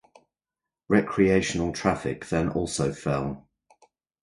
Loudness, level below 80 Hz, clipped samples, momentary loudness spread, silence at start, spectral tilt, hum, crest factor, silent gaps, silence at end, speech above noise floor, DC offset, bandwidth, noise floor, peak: -26 LUFS; -48 dBFS; under 0.1%; 8 LU; 0.9 s; -5.5 dB/octave; none; 22 dB; none; 0.85 s; 65 dB; under 0.1%; 11.5 kHz; -89 dBFS; -6 dBFS